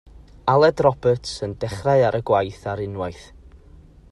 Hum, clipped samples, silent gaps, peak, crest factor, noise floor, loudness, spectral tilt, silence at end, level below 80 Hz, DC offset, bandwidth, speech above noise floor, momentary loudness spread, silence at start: none; under 0.1%; none; -4 dBFS; 18 dB; -47 dBFS; -21 LUFS; -6.5 dB/octave; 0.9 s; -46 dBFS; under 0.1%; 12 kHz; 27 dB; 12 LU; 0.15 s